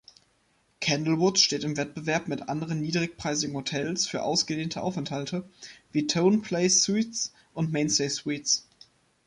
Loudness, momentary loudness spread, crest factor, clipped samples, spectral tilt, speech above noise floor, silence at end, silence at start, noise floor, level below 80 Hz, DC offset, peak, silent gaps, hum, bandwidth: -27 LUFS; 10 LU; 20 dB; under 0.1%; -3.5 dB/octave; 41 dB; 0.65 s; 0.8 s; -68 dBFS; -64 dBFS; under 0.1%; -8 dBFS; none; none; 11.5 kHz